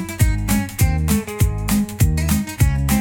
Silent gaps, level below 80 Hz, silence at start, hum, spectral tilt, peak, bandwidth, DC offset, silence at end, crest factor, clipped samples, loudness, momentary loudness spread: none; -24 dBFS; 0 s; none; -5.5 dB/octave; -4 dBFS; 18 kHz; under 0.1%; 0 s; 14 dB; under 0.1%; -19 LUFS; 3 LU